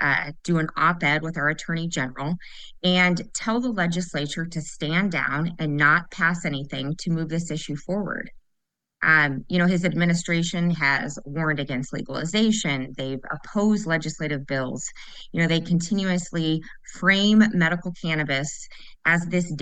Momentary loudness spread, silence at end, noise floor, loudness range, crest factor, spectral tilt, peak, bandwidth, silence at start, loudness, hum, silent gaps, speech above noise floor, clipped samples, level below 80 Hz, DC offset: 12 LU; 0 s; -78 dBFS; 3 LU; 20 dB; -5 dB/octave; -4 dBFS; 9.4 kHz; 0 s; -23 LUFS; none; none; 54 dB; under 0.1%; -50 dBFS; under 0.1%